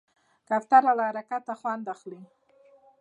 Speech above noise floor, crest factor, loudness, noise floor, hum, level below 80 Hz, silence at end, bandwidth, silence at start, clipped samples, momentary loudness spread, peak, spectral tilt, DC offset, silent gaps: 33 dB; 22 dB; -25 LUFS; -59 dBFS; none; -88 dBFS; 0.75 s; 8.4 kHz; 0.5 s; under 0.1%; 18 LU; -6 dBFS; -6 dB/octave; under 0.1%; none